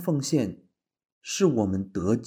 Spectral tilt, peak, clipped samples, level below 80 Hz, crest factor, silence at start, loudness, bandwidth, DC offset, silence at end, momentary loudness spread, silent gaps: -6 dB/octave; -8 dBFS; under 0.1%; -60 dBFS; 18 dB; 0 s; -26 LUFS; over 20 kHz; under 0.1%; 0 s; 10 LU; 1.12-1.21 s